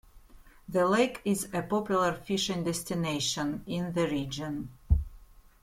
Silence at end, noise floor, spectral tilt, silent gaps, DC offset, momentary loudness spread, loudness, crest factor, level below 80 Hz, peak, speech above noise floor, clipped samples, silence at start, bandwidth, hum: 0.4 s; -54 dBFS; -4.5 dB/octave; none; under 0.1%; 8 LU; -30 LUFS; 18 dB; -42 dBFS; -12 dBFS; 24 dB; under 0.1%; 0.15 s; 16.5 kHz; none